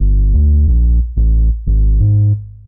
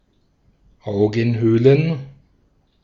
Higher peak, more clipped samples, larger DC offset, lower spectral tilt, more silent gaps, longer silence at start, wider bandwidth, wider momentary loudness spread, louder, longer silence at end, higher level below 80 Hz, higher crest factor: about the same, -4 dBFS vs -2 dBFS; neither; neither; first, -18.5 dB/octave vs -9 dB/octave; neither; second, 0 s vs 0.85 s; second, 0.8 kHz vs 7 kHz; second, 4 LU vs 14 LU; first, -13 LUFS vs -18 LUFS; second, 0.15 s vs 0.75 s; first, -12 dBFS vs -52 dBFS; second, 6 dB vs 18 dB